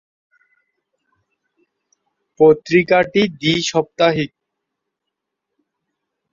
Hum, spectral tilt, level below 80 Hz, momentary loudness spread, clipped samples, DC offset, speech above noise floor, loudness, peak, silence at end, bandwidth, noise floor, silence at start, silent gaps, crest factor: none; -5 dB/octave; -56 dBFS; 6 LU; under 0.1%; under 0.1%; 65 dB; -16 LUFS; -2 dBFS; 2.05 s; 7.6 kHz; -80 dBFS; 2.4 s; none; 18 dB